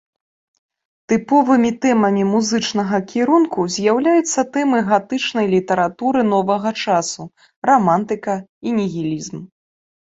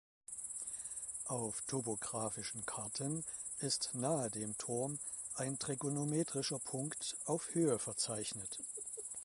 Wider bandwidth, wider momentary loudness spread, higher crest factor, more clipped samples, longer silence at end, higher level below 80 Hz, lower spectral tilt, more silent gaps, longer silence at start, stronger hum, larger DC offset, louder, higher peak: second, 8 kHz vs 12 kHz; first, 9 LU vs 6 LU; about the same, 16 dB vs 18 dB; neither; first, 0.7 s vs 0 s; first, -60 dBFS vs -74 dBFS; first, -5 dB/octave vs -3.5 dB/octave; first, 7.56-7.62 s, 8.49-8.61 s vs none; first, 1.1 s vs 0.3 s; neither; neither; first, -17 LUFS vs -40 LUFS; first, -2 dBFS vs -22 dBFS